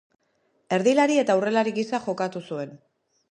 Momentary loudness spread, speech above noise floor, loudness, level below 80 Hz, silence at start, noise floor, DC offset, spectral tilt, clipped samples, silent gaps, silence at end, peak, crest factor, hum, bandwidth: 14 LU; 46 dB; -24 LUFS; -76 dBFS; 0.7 s; -69 dBFS; under 0.1%; -5 dB/octave; under 0.1%; none; 0.55 s; -8 dBFS; 18 dB; none; 11 kHz